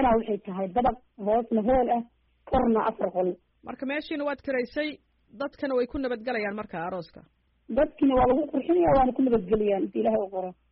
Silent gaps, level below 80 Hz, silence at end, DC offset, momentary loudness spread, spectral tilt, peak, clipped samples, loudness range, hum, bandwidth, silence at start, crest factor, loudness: none; -46 dBFS; 0.2 s; under 0.1%; 12 LU; -5.5 dB/octave; -14 dBFS; under 0.1%; 7 LU; none; 5.6 kHz; 0 s; 14 dB; -27 LUFS